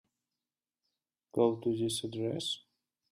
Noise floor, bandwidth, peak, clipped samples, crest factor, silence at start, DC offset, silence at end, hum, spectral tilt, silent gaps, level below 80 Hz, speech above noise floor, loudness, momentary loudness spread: under -90 dBFS; 14.5 kHz; -16 dBFS; under 0.1%; 20 dB; 1.35 s; under 0.1%; 0.55 s; none; -5 dB/octave; none; -74 dBFS; over 58 dB; -34 LUFS; 9 LU